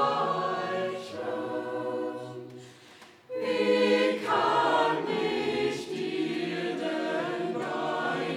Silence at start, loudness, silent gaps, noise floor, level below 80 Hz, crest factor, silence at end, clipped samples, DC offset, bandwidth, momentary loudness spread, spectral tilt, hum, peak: 0 s; -29 LUFS; none; -53 dBFS; -74 dBFS; 18 dB; 0 s; under 0.1%; under 0.1%; 14 kHz; 11 LU; -5 dB/octave; none; -12 dBFS